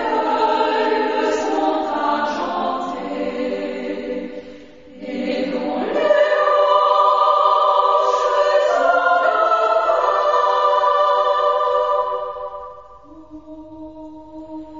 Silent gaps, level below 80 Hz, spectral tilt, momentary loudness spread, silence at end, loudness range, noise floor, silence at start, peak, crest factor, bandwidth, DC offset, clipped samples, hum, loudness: none; -58 dBFS; -4 dB/octave; 20 LU; 0 s; 9 LU; -42 dBFS; 0 s; -2 dBFS; 16 dB; 7.6 kHz; 0.3%; under 0.1%; none; -17 LUFS